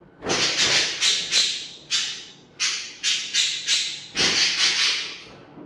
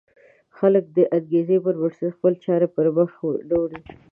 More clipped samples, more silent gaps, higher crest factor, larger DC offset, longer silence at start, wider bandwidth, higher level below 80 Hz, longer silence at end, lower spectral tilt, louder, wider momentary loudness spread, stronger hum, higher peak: neither; neither; about the same, 18 dB vs 16 dB; neither; second, 0.2 s vs 0.6 s; first, 15.5 kHz vs 3.4 kHz; about the same, -62 dBFS vs -60 dBFS; second, 0 s vs 0.2 s; second, 0.5 dB/octave vs -11.5 dB/octave; about the same, -20 LUFS vs -21 LUFS; first, 9 LU vs 6 LU; neither; about the same, -6 dBFS vs -6 dBFS